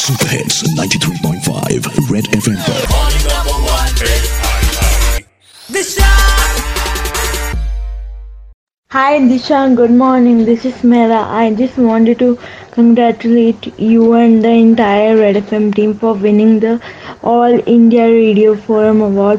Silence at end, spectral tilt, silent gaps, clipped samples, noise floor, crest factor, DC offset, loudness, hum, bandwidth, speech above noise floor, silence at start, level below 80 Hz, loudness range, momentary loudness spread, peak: 0 s; -5 dB/octave; 8.54-8.67 s, 8.78-8.83 s; under 0.1%; -39 dBFS; 10 dB; under 0.1%; -11 LUFS; none; 16 kHz; 29 dB; 0 s; -20 dBFS; 5 LU; 9 LU; 0 dBFS